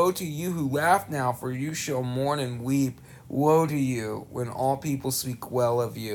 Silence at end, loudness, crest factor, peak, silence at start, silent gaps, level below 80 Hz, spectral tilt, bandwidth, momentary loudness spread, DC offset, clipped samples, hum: 0 s; -27 LUFS; 18 dB; -10 dBFS; 0 s; none; -60 dBFS; -5.5 dB/octave; 19 kHz; 9 LU; under 0.1%; under 0.1%; none